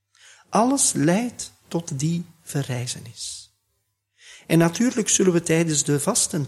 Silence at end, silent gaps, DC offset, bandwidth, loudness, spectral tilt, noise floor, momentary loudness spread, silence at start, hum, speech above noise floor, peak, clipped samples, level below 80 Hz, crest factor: 0 s; none; under 0.1%; 14.5 kHz; -22 LUFS; -4 dB/octave; -74 dBFS; 13 LU; 0.5 s; none; 52 dB; -4 dBFS; under 0.1%; -60 dBFS; 18 dB